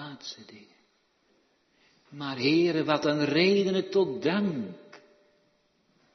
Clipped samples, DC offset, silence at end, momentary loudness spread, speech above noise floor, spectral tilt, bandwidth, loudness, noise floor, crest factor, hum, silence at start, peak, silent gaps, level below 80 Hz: under 0.1%; under 0.1%; 1.15 s; 18 LU; 43 dB; -6 dB/octave; 6.4 kHz; -26 LUFS; -69 dBFS; 18 dB; none; 0 s; -10 dBFS; none; -76 dBFS